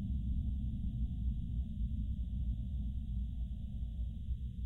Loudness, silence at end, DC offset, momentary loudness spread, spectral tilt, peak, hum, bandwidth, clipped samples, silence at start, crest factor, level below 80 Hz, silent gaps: -41 LUFS; 0 s; under 0.1%; 4 LU; -10 dB/octave; -26 dBFS; none; 3.9 kHz; under 0.1%; 0 s; 12 dB; -38 dBFS; none